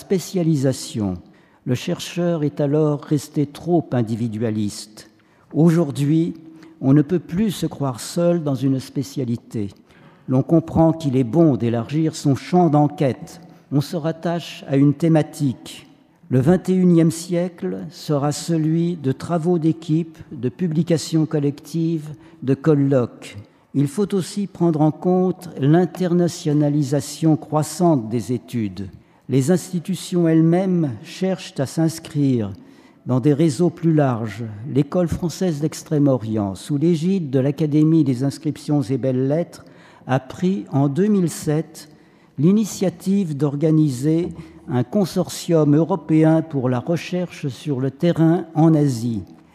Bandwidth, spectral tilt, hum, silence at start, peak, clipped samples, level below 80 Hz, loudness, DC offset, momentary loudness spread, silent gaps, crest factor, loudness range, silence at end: 14.5 kHz; -7.5 dB/octave; none; 0 s; -4 dBFS; under 0.1%; -54 dBFS; -20 LUFS; under 0.1%; 11 LU; none; 16 dB; 3 LU; 0.25 s